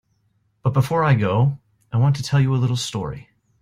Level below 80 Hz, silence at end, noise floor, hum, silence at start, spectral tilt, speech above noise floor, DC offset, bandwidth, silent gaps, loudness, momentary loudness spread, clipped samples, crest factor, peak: -52 dBFS; 0.45 s; -66 dBFS; none; 0.65 s; -6.5 dB/octave; 47 dB; under 0.1%; 12.5 kHz; none; -20 LUFS; 12 LU; under 0.1%; 16 dB; -6 dBFS